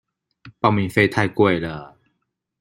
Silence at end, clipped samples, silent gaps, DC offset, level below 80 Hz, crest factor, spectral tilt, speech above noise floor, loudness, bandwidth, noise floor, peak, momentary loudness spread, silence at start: 0.75 s; under 0.1%; none; under 0.1%; -54 dBFS; 20 dB; -7 dB/octave; 56 dB; -19 LUFS; 15.5 kHz; -75 dBFS; -2 dBFS; 10 LU; 0.45 s